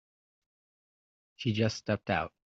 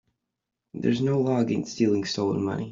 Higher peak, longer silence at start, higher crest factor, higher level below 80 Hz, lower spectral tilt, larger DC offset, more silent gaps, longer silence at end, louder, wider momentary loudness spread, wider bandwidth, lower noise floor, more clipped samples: second, -14 dBFS vs -10 dBFS; first, 1.4 s vs 0.75 s; first, 22 dB vs 16 dB; about the same, -64 dBFS vs -64 dBFS; second, -5 dB/octave vs -6.5 dB/octave; neither; neither; first, 0.25 s vs 0 s; second, -32 LUFS vs -25 LUFS; about the same, 4 LU vs 5 LU; about the same, 7.8 kHz vs 7.6 kHz; first, under -90 dBFS vs -84 dBFS; neither